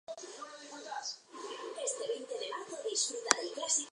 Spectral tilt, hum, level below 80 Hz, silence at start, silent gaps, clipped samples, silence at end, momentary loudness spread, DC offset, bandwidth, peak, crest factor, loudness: 1 dB/octave; none; under -90 dBFS; 0.1 s; none; under 0.1%; 0 s; 15 LU; under 0.1%; 11.5 kHz; -4 dBFS; 34 dB; -36 LUFS